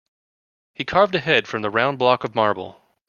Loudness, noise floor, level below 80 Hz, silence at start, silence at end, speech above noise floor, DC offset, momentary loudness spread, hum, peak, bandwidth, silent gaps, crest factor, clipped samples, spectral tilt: -20 LUFS; under -90 dBFS; -58 dBFS; 0.8 s; 0.4 s; over 70 dB; under 0.1%; 11 LU; none; 0 dBFS; 7.2 kHz; none; 22 dB; under 0.1%; -5.5 dB/octave